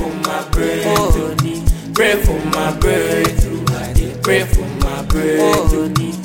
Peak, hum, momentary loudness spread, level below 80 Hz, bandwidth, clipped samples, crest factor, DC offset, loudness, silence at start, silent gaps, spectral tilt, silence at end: -2 dBFS; none; 6 LU; -20 dBFS; 17 kHz; under 0.1%; 14 dB; 0.5%; -16 LUFS; 0 s; none; -5 dB/octave; 0 s